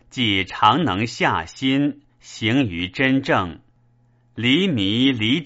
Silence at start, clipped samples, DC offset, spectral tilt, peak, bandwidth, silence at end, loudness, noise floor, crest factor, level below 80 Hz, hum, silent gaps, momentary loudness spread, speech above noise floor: 0.15 s; under 0.1%; under 0.1%; -3 dB/octave; 0 dBFS; 8 kHz; 0 s; -20 LUFS; -58 dBFS; 20 dB; -52 dBFS; none; none; 8 LU; 38 dB